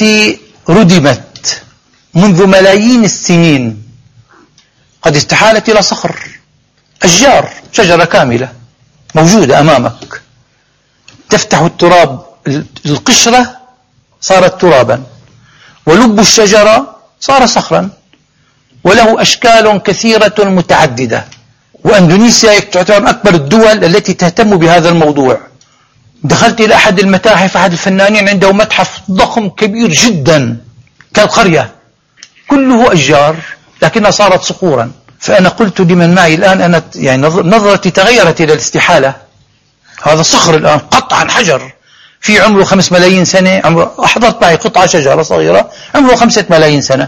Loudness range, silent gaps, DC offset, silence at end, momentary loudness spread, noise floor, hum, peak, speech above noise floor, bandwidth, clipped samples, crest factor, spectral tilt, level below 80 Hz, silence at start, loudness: 3 LU; none; under 0.1%; 0 s; 11 LU; -52 dBFS; none; 0 dBFS; 46 dB; 16 kHz; 3%; 8 dB; -4 dB/octave; -38 dBFS; 0 s; -7 LUFS